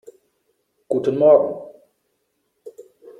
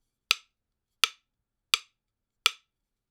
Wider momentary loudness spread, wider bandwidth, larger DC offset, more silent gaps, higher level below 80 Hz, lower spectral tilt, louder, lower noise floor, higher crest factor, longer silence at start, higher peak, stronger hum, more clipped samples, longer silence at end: first, 13 LU vs 1 LU; second, 4.2 kHz vs over 20 kHz; neither; neither; about the same, -68 dBFS vs -72 dBFS; first, -8.5 dB/octave vs 3.5 dB/octave; first, -17 LUFS vs -28 LUFS; second, -71 dBFS vs -84 dBFS; second, 20 dB vs 34 dB; first, 0.9 s vs 0.3 s; about the same, -2 dBFS vs 0 dBFS; neither; neither; about the same, 0.5 s vs 0.6 s